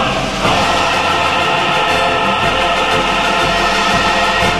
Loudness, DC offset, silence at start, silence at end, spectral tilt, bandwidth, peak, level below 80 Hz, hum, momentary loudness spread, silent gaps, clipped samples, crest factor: -13 LUFS; 1%; 0 s; 0 s; -3 dB/octave; 13.5 kHz; 0 dBFS; -34 dBFS; none; 1 LU; none; under 0.1%; 14 dB